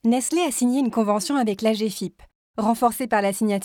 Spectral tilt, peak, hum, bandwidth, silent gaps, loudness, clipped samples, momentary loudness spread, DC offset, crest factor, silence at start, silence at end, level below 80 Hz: -4.5 dB/octave; -8 dBFS; none; 18.5 kHz; 2.35-2.54 s; -22 LUFS; under 0.1%; 6 LU; under 0.1%; 14 dB; 0.05 s; 0 s; -60 dBFS